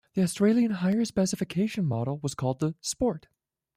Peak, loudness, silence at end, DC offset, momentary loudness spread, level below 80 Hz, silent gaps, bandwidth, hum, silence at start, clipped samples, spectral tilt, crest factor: -12 dBFS; -27 LUFS; 0.6 s; under 0.1%; 7 LU; -58 dBFS; none; 15 kHz; none; 0.15 s; under 0.1%; -6 dB/octave; 16 dB